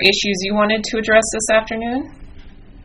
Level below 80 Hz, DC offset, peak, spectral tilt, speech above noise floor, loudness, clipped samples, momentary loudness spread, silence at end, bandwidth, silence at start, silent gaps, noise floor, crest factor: -40 dBFS; under 0.1%; 0 dBFS; -2.5 dB/octave; 21 dB; -17 LUFS; under 0.1%; 10 LU; 0 s; 11.5 kHz; 0 s; none; -38 dBFS; 18 dB